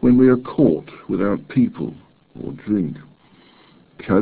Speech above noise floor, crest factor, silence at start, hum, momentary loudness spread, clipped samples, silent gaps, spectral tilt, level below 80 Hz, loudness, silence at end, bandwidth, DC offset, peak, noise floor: 32 dB; 18 dB; 0 s; none; 19 LU; under 0.1%; none; -12.5 dB/octave; -50 dBFS; -19 LUFS; 0 s; 4 kHz; under 0.1%; -2 dBFS; -51 dBFS